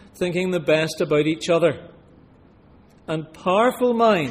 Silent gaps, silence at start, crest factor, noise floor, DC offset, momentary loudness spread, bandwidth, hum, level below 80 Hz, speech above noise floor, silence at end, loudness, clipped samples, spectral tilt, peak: none; 0.15 s; 16 dB; -51 dBFS; under 0.1%; 11 LU; 15.5 kHz; none; -58 dBFS; 31 dB; 0 s; -21 LUFS; under 0.1%; -5.5 dB/octave; -6 dBFS